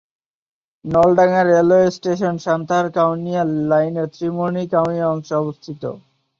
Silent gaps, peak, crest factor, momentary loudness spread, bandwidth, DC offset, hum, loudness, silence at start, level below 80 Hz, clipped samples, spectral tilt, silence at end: none; -2 dBFS; 16 dB; 13 LU; 7.4 kHz; under 0.1%; none; -17 LUFS; 0.85 s; -56 dBFS; under 0.1%; -7.5 dB/octave; 0.4 s